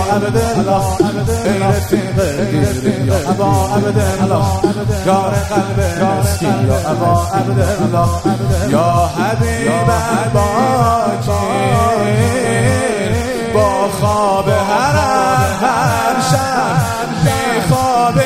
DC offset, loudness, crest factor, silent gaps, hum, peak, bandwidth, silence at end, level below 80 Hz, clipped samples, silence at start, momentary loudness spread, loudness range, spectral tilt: under 0.1%; -14 LUFS; 12 dB; none; none; 0 dBFS; 16 kHz; 0 s; -30 dBFS; under 0.1%; 0 s; 3 LU; 1 LU; -6 dB/octave